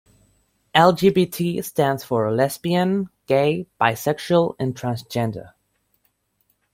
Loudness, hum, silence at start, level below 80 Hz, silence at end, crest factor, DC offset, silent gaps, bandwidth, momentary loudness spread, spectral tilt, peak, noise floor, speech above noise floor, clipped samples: -21 LUFS; 50 Hz at -50 dBFS; 0.75 s; -58 dBFS; 1.25 s; 20 dB; under 0.1%; none; 16.5 kHz; 10 LU; -6 dB/octave; -2 dBFS; -68 dBFS; 48 dB; under 0.1%